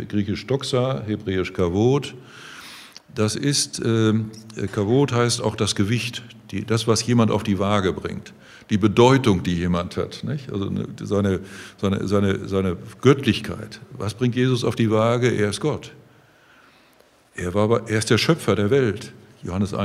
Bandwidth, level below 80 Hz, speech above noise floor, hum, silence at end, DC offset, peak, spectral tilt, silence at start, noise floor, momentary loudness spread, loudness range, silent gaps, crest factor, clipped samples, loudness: 15 kHz; -52 dBFS; 34 dB; none; 0 s; under 0.1%; -2 dBFS; -5.5 dB/octave; 0 s; -56 dBFS; 15 LU; 4 LU; none; 20 dB; under 0.1%; -22 LUFS